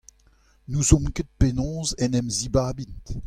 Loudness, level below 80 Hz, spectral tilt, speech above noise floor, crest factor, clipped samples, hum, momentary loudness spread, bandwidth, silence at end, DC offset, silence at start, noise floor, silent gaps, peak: -24 LUFS; -32 dBFS; -5 dB/octave; 35 dB; 22 dB; under 0.1%; none; 11 LU; 14.5 kHz; 0 s; under 0.1%; 0.7 s; -59 dBFS; none; -4 dBFS